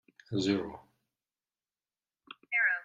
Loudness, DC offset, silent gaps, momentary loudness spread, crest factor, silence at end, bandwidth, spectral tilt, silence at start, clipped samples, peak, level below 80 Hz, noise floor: -32 LUFS; under 0.1%; none; 24 LU; 18 dB; 0 s; 9.2 kHz; -5 dB/octave; 0.3 s; under 0.1%; -16 dBFS; -72 dBFS; under -90 dBFS